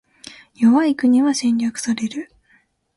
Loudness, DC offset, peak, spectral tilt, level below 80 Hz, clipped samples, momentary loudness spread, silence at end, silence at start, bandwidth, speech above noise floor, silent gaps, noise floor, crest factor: -18 LUFS; under 0.1%; -6 dBFS; -4 dB/octave; -64 dBFS; under 0.1%; 13 LU; 0.75 s; 0.6 s; 11.5 kHz; 42 dB; none; -59 dBFS; 14 dB